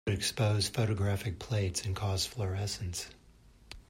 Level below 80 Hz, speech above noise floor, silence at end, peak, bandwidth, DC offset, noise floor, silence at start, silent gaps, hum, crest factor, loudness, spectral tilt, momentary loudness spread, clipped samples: -54 dBFS; 27 dB; 0.1 s; -18 dBFS; 16 kHz; under 0.1%; -59 dBFS; 0.05 s; none; none; 16 dB; -33 LUFS; -4.5 dB/octave; 9 LU; under 0.1%